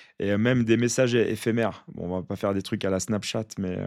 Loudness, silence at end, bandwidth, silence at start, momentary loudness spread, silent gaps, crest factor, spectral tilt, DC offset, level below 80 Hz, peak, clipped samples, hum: -26 LUFS; 0 s; 15 kHz; 0 s; 9 LU; none; 16 dB; -5.5 dB/octave; under 0.1%; -62 dBFS; -8 dBFS; under 0.1%; none